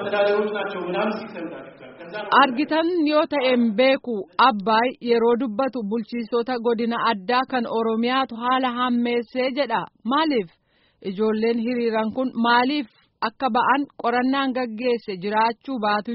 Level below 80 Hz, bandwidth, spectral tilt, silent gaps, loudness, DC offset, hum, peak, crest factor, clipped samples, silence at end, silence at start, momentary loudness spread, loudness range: -68 dBFS; 5.8 kHz; -2.5 dB/octave; none; -22 LUFS; under 0.1%; none; -4 dBFS; 18 dB; under 0.1%; 0 s; 0 s; 9 LU; 4 LU